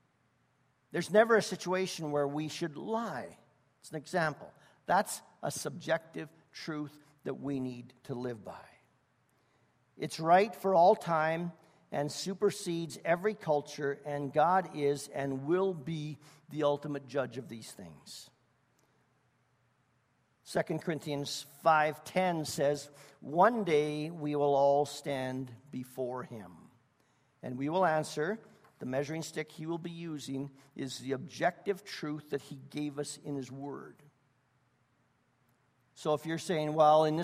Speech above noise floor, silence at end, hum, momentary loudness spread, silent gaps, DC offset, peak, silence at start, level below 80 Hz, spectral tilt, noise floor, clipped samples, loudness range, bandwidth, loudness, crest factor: 41 dB; 0 s; none; 18 LU; none; under 0.1%; -12 dBFS; 0.95 s; -76 dBFS; -5 dB/octave; -73 dBFS; under 0.1%; 11 LU; 15.5 kHz; -33 LUFS; 22 dB